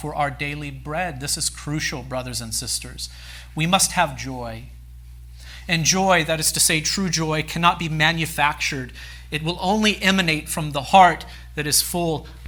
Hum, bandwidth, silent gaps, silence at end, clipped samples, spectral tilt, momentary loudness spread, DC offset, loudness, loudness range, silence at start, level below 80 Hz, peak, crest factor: none; over 20 kHz; none; 0 s; under 0.1%; -3 dB/octave; 16 LU; under 0.1%; -20 LUFS; 5 LU; 0 s; -40 dBFS; 0 dBFS; 22 dB